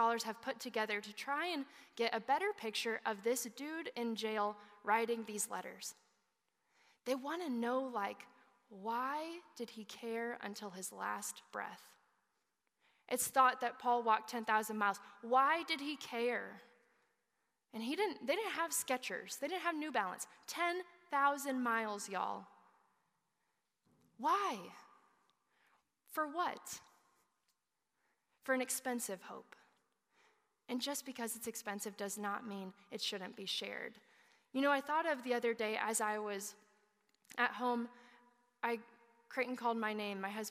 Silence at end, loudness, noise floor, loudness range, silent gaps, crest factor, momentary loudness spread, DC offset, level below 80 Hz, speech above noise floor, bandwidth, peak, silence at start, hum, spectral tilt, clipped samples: 0 s; -39 LUFS; -87 dBFS; 8 LU; none; 22 dB; 13 LU; under 0.1%; under -90 dBFS; 48 dB; 15.5 kHz; -18 dBFS; 0 s; none; -2 dB/octave; under 0.1%